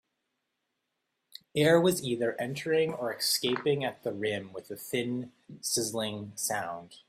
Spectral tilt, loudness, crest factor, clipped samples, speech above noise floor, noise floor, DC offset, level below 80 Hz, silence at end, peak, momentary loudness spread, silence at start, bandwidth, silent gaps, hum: -3.5 dB/octave; -30 LUFS; 22 dB; under 0.1%; 52 dB; -82 dBFS; under 0.1%; -70 dBFS; 0.15 s; -10 dBFS; 13 LU; 1.55 s; 16 kHz; none; none